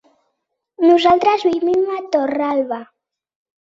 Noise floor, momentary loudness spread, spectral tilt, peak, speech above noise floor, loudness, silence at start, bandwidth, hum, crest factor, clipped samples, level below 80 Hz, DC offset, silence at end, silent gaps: -74 dBFS; 9 LU; -5 dB/octave; -2 dBFS; 59 dB; -16 LUFS; 0.8 s; 7.6 kHz; none; 16 dB; under 0.1%; -60 dBFS; under 0.1%; 0.8 s; none